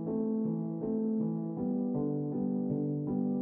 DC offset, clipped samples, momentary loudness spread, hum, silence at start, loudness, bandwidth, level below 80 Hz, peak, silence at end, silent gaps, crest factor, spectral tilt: under 0.1%; under 0.1%; 2 LU; none; 0 s; -33 LUFS; 1.9 kHz; -66 dBFS; -20 dBFS; 0 s; none; 12 dB; -12.5 dB/octave